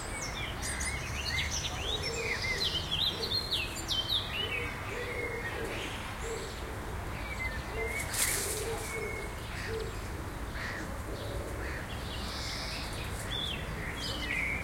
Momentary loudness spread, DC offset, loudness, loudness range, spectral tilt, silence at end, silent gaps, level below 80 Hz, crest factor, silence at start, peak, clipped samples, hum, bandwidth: 9 LU; under 0.1%; -34 LUFS; 7 LU; -2.5 dB/octave; 0 s; none; -44 dBFS; 22 dB; 0 s; -14 dBFS; under 0.1%; none; 16.5 kHz